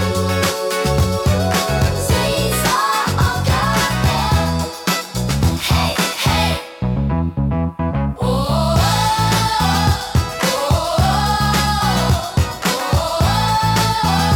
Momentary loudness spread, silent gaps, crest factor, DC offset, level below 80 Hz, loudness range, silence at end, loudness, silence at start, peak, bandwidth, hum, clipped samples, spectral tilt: 4 LU; none; 14 dB; under 0.1%; -28 dBFS; 2 LU; 0 s; -17 LUFS; 0 s; -2 dBFS; 17.5 kHz; none; under 0.1%; -4.5 dB/octave